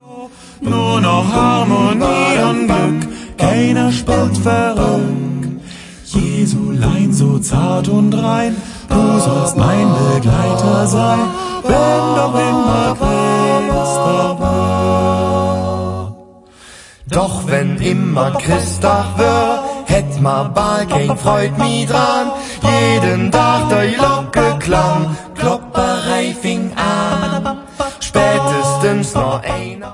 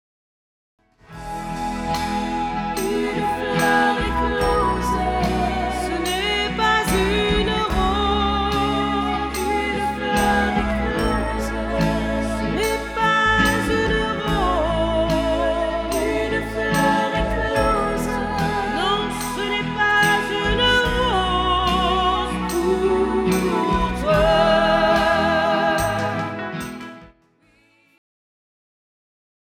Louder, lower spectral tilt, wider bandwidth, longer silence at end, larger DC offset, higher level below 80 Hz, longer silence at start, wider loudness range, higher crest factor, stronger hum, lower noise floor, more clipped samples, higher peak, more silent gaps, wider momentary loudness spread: first, -14 LUFS vs -20 LUFS; about the same, -5.5 dB/octave vs -4.5 dB/octave; second, 11.5 kHz vs 19.5 kHz; second, 0 s vs 2.4 s; neither; about the same, -32 dBFS vs -32 dBFS; second, 0.05 s vs 1.1 s; about the same, 3 LU vs 4 LU; about the same, 14 dB vs 14 dB; neither; second, -40 dBFS vs -58 dBFS; neither; first, 0 dBFS vs -6 dBFS; neither; about the same, 7 LU vs 7 LU